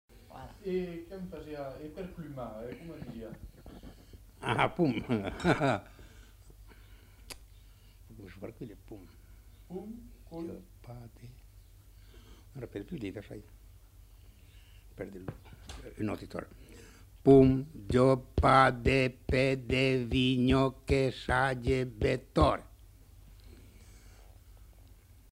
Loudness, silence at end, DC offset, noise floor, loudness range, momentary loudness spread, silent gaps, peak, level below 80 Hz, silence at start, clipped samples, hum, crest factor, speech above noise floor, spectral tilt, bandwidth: -29 LUFS; 0.8 s; under 0.1%; -56 dBFS; 21 LU; 24 LU; none; -8 dBFS; -46 dBFS; 0.35 s; under 0.1%; none; 24 dB; 26 dB; -7 dB/octave; 16 kHz